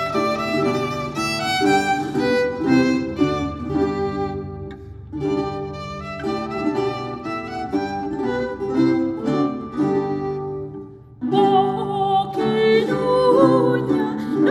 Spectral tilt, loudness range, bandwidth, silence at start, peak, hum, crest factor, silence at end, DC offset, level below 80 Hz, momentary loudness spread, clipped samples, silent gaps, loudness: -6 dB/octave; 8 LU; 14 kHz; 0 s; -2 dBFS; none; 18 dB; 0 s; under 0.1%; -46 dBFS; 12 LU; under 0.1%; none; -21 LUFS